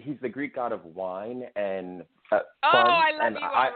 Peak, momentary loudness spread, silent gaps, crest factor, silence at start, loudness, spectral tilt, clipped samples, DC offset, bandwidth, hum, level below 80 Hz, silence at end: -4 dBFS; 16 LU; none; 22 dB; 0.05 s; -25 LUFS; -8 dB/octave; under 0.1%; under 0.1%; 4.7 kHz; none; -72 dBFS; 0 s